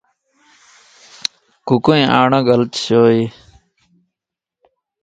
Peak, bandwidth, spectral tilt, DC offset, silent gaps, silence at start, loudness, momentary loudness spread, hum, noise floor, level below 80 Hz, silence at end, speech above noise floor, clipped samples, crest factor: 0 dBFS; 11 kHz; -6 dB/octave; under 0.1%; none; 1.65 s; -15 LUFS; 13 LU; none; -85 dBFS; -54 dBFS; 1.75 s; 72 dB; under 0.1%; 18 dB